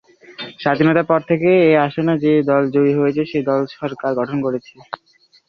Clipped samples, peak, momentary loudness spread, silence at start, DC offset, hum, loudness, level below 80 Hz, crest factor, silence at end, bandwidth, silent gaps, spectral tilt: under 0.1%; -2 dBFS; 19 LU; 0.3 s; under 0.1%; none; -17 LUFS; -58 dBFS; 16 dB; 0.55 s; 6.2 kHz; none; -9 dB/octave